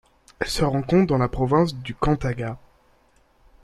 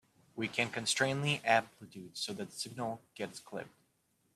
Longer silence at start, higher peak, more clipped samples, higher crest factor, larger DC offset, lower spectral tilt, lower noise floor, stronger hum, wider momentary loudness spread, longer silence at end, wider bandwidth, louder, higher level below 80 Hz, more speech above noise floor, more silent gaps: about the same, 0.4 s vs 0.35 s; first, -6 dBFS vs -14 dBFS; neither; about the same, 18 dB vs 22 dB; neither; first, -6.5 dB/octave vs -3.5 dB/octave; second, -60 dBFS vs -76 dBFS; neither; second, 11 LU vs 18 LU; first, 1.05 s vs 0.65 s; about the same, 13.5 kHz vs 14 kHz; first, -23 LUFS vs -35 LUFS; first, -40 dBFS vs -76 dBFS; about the same, 38 dB vs 40 dB; neither